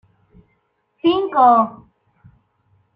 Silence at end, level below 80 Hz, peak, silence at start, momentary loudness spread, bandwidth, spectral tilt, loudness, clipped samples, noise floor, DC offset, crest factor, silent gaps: 1.25 s; -60 dBFS; -2 dBFS; 1.05 s; 9 LU; 5.4 kHz; -8 dB/octave; -16 LUFS; under 0.1%; -67 dBFS; under 0.1%; 18 dB; none